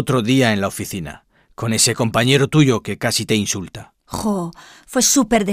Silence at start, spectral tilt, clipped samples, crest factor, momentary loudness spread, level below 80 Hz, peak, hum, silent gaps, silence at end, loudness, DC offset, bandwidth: 0 s; -4 dB/octave; under 0.1%; 18 dB; 15 LU; -46 dBFS; 0 dBFS; none; none; 0 s; -17 LUFS; under 0.1%; 16 kHz